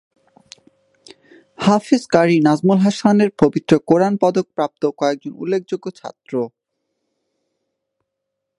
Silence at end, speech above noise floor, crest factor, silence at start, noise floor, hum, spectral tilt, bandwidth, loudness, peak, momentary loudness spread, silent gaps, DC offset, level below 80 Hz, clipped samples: 2.1 s; 62 dB; 18 dB; 1.6 s; -78 dBFS; none; -6.5 dB/octave; 11 kHz; -17 LUFS; 0 dBFS; 12 LU; none; under 0.1%; -60 dBFS; under 0.1%